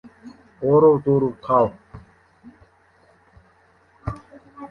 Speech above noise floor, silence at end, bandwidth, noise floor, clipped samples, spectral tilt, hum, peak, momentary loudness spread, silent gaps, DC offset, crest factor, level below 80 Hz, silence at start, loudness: 40 dB; 0.05 s; 4.6 kHz; -57 dBFS; under 0.1%; -10.5 dB/octave; none; -4 dBFS; 20 LU; none; under 0.1%; 20 dB; -50 dBFS; 0.25 s; -18 LUFS